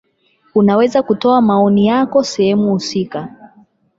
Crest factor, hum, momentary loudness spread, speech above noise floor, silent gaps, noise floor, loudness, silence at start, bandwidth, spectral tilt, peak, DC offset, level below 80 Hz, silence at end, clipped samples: 12 dB; none; 9 LU; 45 dB; none; -57 dBFS; -14 LUFS; 0.55 s; 7.8 kHz; -6.5 dB/octave; -2 dBFS; under 0.1%; -56 dBFS; 0.7 s; under 0.1%